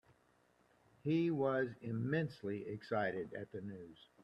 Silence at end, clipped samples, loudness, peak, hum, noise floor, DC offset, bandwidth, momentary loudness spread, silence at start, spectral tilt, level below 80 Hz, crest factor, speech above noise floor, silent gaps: 0.3 s; under 0.1%; -39 LUFS; -22 dBFS; none; -73 dBFS; under 0.1%; 8.6 kHz; 13 LU; 1.05 s; -8.5 dB/octave; -76 dBFS; 18 dB; 34 dB; none